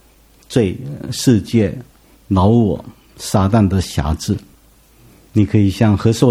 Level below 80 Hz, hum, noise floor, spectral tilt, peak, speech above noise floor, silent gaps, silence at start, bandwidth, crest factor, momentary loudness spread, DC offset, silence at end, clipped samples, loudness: -36 dBFS; none; -49 dBFS; -7 dB/octave; 0 dBFS; 34 dB; none; 0.5 s; 15 kHz; 16 dB; 11 LU; under 0.1%; 0 s; under 0.1%; -16 LUFS